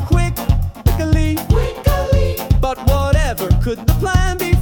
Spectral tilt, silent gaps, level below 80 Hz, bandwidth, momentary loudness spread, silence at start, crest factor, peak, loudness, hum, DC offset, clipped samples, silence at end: -6.5 dB/octave; none; -18 dBFS; 18 kHz; 2 LU; 0 s; 12 dB; -2 dBFS; -17 LUFS; none; under 0.1%; under 0.1%; 0 s